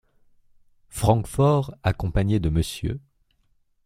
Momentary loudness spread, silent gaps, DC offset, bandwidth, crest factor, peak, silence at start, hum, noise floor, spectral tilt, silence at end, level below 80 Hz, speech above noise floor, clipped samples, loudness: 11 LU; none; under 0.1%; 16 kHz; 20 dB; -4 dBFS; 0.95 s; none; -65 dBFS; -7 dB/octave; 0.85 s; -38 dBFS; 43 dB; under 0.1%; -23 LUFS